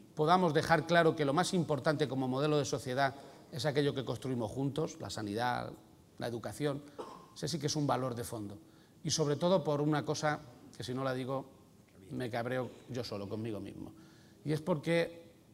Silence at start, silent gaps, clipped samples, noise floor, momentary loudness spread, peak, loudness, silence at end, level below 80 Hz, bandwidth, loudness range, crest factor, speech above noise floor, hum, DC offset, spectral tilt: 0 s; none; under 0.1%; -59 dBFS; 17 LU; -12 dBFS; -34 LUFS; 0.25 s; -66 dBFS; 16 kHz; 8 LU; 22 dB; 26 dB; none; under 0.1%; -5 dB/octave